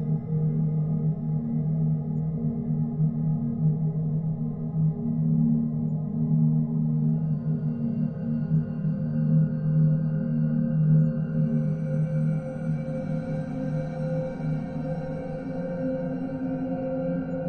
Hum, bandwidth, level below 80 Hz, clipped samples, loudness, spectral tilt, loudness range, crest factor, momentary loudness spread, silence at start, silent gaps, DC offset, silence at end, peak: none; 2.9 kHz; -52 dBFS; under 0.1%; -27 LUFS; -12 dB/octave; 6 LU; 14 dB; 7 LU; 0 s; none; under 0.1%; 0 s; -12 dBFS